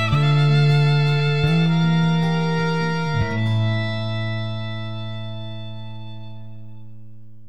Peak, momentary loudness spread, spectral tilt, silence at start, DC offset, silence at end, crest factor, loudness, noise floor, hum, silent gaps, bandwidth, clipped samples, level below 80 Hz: -6 dBFS; 19 LU; -7.5 dB/octave; 0 s; 2%; 0 s; 14 dB; -20 LUFS; -45 dBFS; none; none; 8.2 kHz; under 0.1%; -46 dBFS